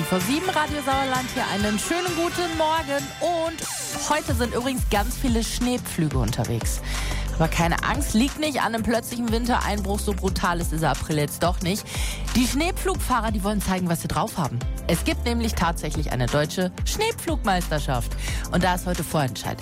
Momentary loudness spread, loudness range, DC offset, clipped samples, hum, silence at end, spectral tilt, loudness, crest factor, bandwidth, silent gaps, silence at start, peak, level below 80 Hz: 5 LU; 1 LU; under 0.1%; under 0.1%; none; 0 s; -4.5 dB/octave; -24 LUFS; 14 dB; 16 kHz; none; 0 s; -10 dBFS; -32 dBFS